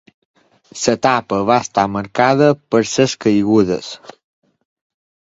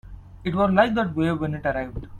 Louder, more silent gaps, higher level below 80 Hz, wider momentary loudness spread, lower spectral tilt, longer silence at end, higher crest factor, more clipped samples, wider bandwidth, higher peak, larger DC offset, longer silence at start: first, -16 LUFS vs -23 LUFS; neither; second, -52 dBFS vs -42 dBFS; about the same, 9 LU vs 10 LU; second, -5 dB/octave vs -8 dB/octave; first, 1.3 s vs 0 s; about the same, 18 dB vs 20 dB; neither; second, 7.8 kHz vs 10 kHz; first, 0 dBFS vs -4 dBFS; neither; first, 0.75 s vs 0.05 s